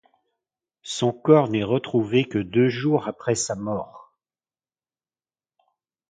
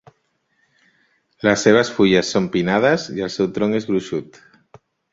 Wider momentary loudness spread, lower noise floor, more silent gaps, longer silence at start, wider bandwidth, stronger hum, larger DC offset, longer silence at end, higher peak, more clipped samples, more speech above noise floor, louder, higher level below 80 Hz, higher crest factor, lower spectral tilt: first, 13 LU vs 8 LU; first, under -90 dBFS vs -67 dBFS; neither; second, 0.85 s vs 1.45 s; first, 9.6 kHz vs 7.8 kHz; neither; neither; first, 2.15 s vs 0.9 s; about the same, -2 dBFS vs -2 dBFS; neither; first, over 68 dB vs 49 dB; second, -22 LUFS vs -18 LUFS; second, -60 dBFS vs -54 dBFS; about the same, 22 dB vs 18 dB; about the same, -5.5 dB/octave vs -5 dB/octave